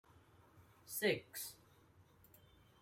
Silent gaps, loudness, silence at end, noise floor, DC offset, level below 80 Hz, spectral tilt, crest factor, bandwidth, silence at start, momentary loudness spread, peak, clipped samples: none; -41 LUFS; 1.25 s; -68 dBFS; under 0.1%; -78 dBFS; -3 dB/octave; 22 dB; 16 kHz; 0.55 s; 26 LU; -24 dBFS; under 0.1%